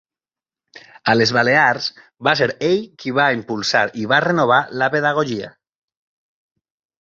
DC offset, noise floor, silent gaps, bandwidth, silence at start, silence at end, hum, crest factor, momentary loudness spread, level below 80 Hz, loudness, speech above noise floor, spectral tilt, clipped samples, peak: under 0.1%; under -90 dBFS; none; 7.8 kHz; 0.75 s; 1.5 s; none; 18 dB; 10 LU; -60 dBFS; -17 LUFS; over 72 dB; -4.5 dB/octave; under 0.1%; -2 dBFS